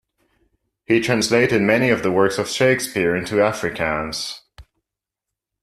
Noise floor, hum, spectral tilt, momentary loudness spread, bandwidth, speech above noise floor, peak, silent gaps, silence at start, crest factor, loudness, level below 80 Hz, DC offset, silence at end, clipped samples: -85 dBFS; none; -4.5 dB/octave; 8 LU; 14 kHz; 66 dB; -2 dBFS; none; 0.9 s; 18 dB; -19 LUFS; -52 dBFS; under 0.1%; 1 s; under 0.1%